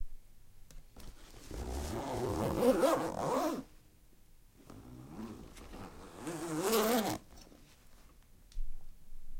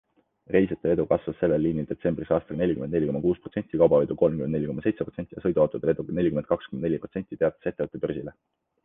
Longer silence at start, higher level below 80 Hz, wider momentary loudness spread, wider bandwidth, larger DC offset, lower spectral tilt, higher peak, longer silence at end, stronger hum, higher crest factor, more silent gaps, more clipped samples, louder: second, 0 s vs 0.5 s; about the same, -48 dBFS vs -52 dBFS; first, 25 LU vs 8 LU; first, 16.5 kHz vs 3.8 kHz; neither; second, -4.5 dB/octave vs -11.5 dB/octave; second, -16 dBFS vs -6 dBFS; second, 0 s vs 0.55 s; neither; about the same, 20 dB vs 20 dB; neither; neither; second, -35 LUFS vs -26 LUFS